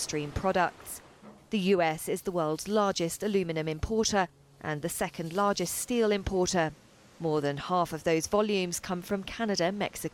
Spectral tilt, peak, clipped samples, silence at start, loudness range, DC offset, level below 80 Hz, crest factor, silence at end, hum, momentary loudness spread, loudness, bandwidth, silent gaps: -4.5 dB/octave; -14 dBFS; under 0.1%; 0 s; 1 LU; under 0.1%; -50 dBFS; 16 dB; 0.05 s; none; 7 LU; -30 LUFS; 17.5 kHz; none